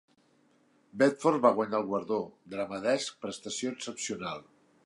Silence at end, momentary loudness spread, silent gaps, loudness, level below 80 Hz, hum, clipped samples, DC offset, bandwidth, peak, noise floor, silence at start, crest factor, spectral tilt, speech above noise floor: 0.45 s; 14 LU; none; -31 LUFS; -74 dBFS; none; under 0.1%; under 0.1%; 11.5 kHz; -10 dBFS; -67 dBFS; 0.95 s; 22 dB; -4 dB/octave; 37 dB